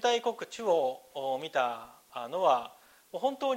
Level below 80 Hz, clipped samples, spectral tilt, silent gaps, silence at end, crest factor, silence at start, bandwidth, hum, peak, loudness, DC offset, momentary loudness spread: -80 dBFS; under 0.1%; -3 dB/octave; none; 0 s; 18 dB; 0 s; 16 kHz; none; -12 dBFS; -31 LUFS; under 0.1%; 16 LU